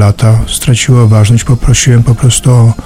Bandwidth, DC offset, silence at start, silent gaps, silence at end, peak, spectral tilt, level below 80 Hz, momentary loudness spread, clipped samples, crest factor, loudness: 15.5 kHz; under 0.1%; 0 s; none; 0 s; 0 dBFS; -5 dB/octave; -20 dBFS; 3 LU; 1%; 6 dB; -7 LUFS